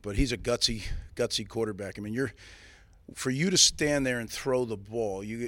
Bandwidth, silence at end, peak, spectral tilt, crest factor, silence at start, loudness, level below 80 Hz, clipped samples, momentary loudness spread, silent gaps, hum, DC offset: 16.5 kHz; 0 s; -8 dBFS; -3 dB/octave; 22 dB; 0.05 s; -28 LUFS; -42 dBFS; under 0.1%; 14 LU; none; none; under 0.1%